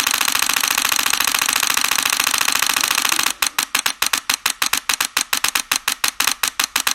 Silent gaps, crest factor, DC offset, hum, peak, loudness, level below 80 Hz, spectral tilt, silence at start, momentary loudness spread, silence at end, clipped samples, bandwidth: none; 20 dB; under 0.1%; none; 0 dBFS; -17 LUFS; -56 dBFS; 2 dB/octave; 0 s; 3 LU; 0 s; under 0.1%; over 20 kHz